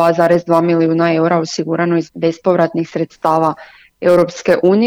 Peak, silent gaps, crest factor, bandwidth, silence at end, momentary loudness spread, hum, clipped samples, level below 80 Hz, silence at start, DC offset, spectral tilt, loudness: 0 dBFS; none; 12 dB; 13.5 kHz; 0 s; 7 LU; none; under 0.1%; -56 dBFS; 0 s; under 0.1%; -6.5 dB/octave; -14 LUFS